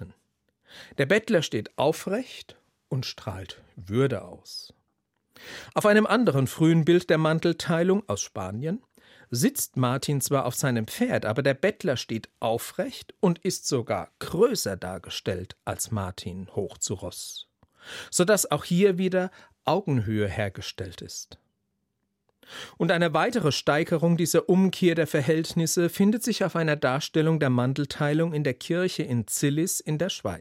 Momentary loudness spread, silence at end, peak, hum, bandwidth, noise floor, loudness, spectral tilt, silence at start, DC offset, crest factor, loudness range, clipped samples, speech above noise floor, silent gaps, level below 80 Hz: 15 LU; 0 s; -8 dBFS; none; 16.5 kHz; -78 dBFS; -25 LUFS; -5 dB/octave; 0 s; under 0.1%; 18 dB; 7 LU; under 0.1%; 52 dB; none; -64 dBFS